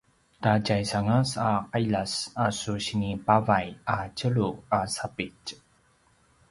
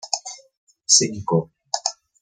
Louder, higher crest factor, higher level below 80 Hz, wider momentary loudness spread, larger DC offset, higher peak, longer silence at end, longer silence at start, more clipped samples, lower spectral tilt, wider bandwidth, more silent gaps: second, -27 LUFS vs -20 LUFS; about the same, 22 dB vs 22 dB; first, -54 dBFS vs -66 dBFS; second, 7 LU vs 16 LU; neither; second, -6 dBFS vs -2 dBFS; first, 0.95 s vs 0.3 s; first, 0.4 s vs 0.05 s; neither; first, -5.5 dB/octave vs -2.5 dB/octave; about the same, 11.5 kHz vs 10.5 kHz; second, none vs 0.57-0.67 s